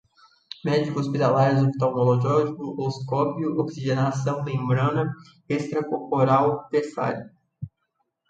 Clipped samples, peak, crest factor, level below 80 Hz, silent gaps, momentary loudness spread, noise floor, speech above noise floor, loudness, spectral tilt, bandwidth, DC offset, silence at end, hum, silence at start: under 0.1%; -8 dBFS; 16 dB; -62 dBFS; none; 12 LU; -75 dBFS; 52 dB; -24 LUFS; -7.5 dB/octave; 7.8 kHz; under 0.1%; 0.6 s; none; 0.65 s